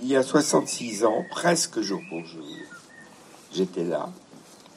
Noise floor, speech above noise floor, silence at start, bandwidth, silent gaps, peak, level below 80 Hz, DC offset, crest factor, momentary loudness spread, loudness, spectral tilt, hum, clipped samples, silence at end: -49 dBFS; 24 dB; 0 s; 15.5 kHz; none; -8 dBFS; -76 dBFS; under 0.1%; 20 dB; 19 LU; -25 LUFS; -4 dB/octave; none; under 0.1%; 0.2 s